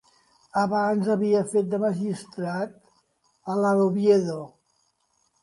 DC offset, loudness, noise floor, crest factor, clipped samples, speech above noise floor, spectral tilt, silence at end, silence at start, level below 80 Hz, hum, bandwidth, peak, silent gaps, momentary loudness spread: under 0.1%; -24 LUFS; -70 dBFS; 18 dB; under 0.1%; 46 dB; -7 dB/octave; 0.95 s; 0.55 s; -70 dBFS; none; 11.5 kHz; -8 dBFS; none; 12 LU